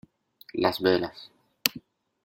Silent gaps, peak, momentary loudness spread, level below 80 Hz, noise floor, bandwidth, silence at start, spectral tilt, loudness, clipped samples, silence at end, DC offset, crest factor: none; 0 dBFS; 19 LU; -66 dBFS; -55 dBFS; 16.5 kHz; 0.55 s; -3.5 dB/octave; -27 LUFS; under 0.1%; 0.45 s; under 0.1%; 30 dB